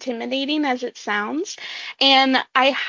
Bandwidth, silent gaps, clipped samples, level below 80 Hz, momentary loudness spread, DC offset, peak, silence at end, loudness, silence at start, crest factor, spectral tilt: 7.6 kHz; none; under 0.1%; -72 dBFS; 14 LU; under 0.1%; -2 dBFS; 0 s; -19 LUFS; 0 s; 18 dB; -2 dB/octave